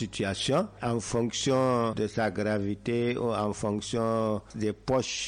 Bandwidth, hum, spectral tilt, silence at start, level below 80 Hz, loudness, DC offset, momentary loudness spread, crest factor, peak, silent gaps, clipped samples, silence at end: 11 kHz; none; -5 dB/octave; 0 s; -56 dBFS; -29 LUFS; under 0.1%; 5 LU; 12 dB; -16 dBFS; none; under 0.1%; 0 s